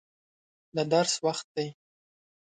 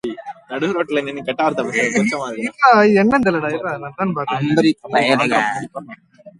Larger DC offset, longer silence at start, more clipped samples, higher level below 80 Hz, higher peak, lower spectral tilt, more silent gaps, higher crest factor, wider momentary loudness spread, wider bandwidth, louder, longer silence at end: neither; first, 0.75 s vs 0.05 s; neither; second, -74 dBFS vs -56 dBFS; second, -10 dBFS vs 0 dBFS; second, -3.5 dB/octave vs -5.5 dB/octave; first, 1.44-1.55 s vs none; about the same, 20 dB vs 18 dB; second, 11 LU vs 14 LU; second, 9.6 kHz vs 11.5 kHz; second, -29 LUFS vs -17 LUFS; first, 0.7 s vs 0.1 s